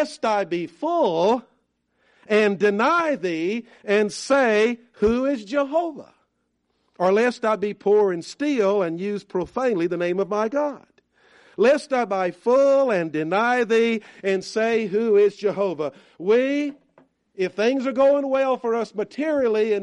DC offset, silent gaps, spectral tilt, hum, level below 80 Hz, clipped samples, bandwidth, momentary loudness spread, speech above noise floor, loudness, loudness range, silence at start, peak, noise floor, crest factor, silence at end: under 0.1%; none; -5.5 dB/octave; none; -58 dBFS; under 0.1%; 11 kHz; 8 LU; 51 dB; -22 LUFS; 3 LU; 0 s; -8 dBFS; -72 dBFS; 14 dB; 0 s